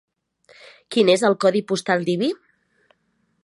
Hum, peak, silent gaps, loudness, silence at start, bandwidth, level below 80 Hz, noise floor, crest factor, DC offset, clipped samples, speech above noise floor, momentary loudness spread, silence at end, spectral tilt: none; -4 dBFS; none; -20 LUFS; 0.9 s; 11.5 kHz; -72 dBFS; -68 dBFS; 18 dB; under 0.1%; under 0.1%; 49 dB; 9 LU; 1.1 s; -5 dB/octave